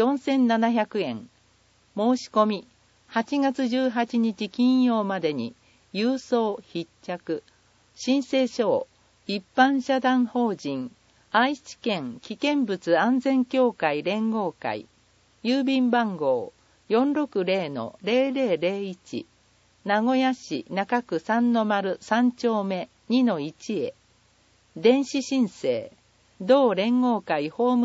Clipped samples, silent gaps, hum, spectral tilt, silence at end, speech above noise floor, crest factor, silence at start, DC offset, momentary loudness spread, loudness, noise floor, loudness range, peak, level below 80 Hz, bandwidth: under 0.1%; none; none; -5.5 dB/octave; 0 s; 38 dB; 20 dB; 0 s; under 0.1%; 12 LU; -25 LUFS; -62 dBFS; 2 LU; -4 dBFS; -72 dBFS; 8 kHz